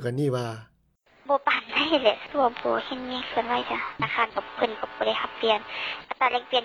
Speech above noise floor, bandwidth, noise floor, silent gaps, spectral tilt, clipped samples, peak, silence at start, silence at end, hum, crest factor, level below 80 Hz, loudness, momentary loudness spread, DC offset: 36 dB; 13 kHz; -62 dBFS; none; -5.5 dB/octave; under 0.1%; -6 dBFS; 0 s; 0 s; none; 20 dB; -62 dBFS; -26 LUFS; 8 LU; under 0.1%